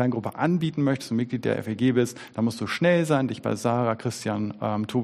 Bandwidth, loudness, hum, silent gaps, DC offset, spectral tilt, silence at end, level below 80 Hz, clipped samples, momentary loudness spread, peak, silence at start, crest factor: 14 kHz; -25 LUFS; none; none; under 0.1%; -6.5 dB/octave; 0 s; -64 dBFS; under 0.1%; 7 LU; -8 dBFS; 0 s; 16 dB